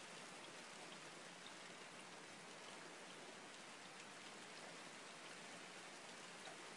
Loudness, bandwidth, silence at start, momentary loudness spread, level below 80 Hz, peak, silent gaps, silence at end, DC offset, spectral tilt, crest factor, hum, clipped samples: -55 LUFS; 12 kHz; 0 s; 1 LU; under -90 dBFS; -40 dBFS; none; 0 s; under 0.1%; -2 dB/octave; 16 dB; none; under 0.1%